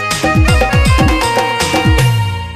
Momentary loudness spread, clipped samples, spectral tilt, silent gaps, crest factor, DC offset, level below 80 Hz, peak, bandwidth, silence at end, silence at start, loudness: 3 LU; under 0.1%; -5 dB/octave; none; 12 dB; under 0.1%; -18 dBFS; 0 dBFS; 15.5 kHz; 0 s; 0 s; -12 LUFS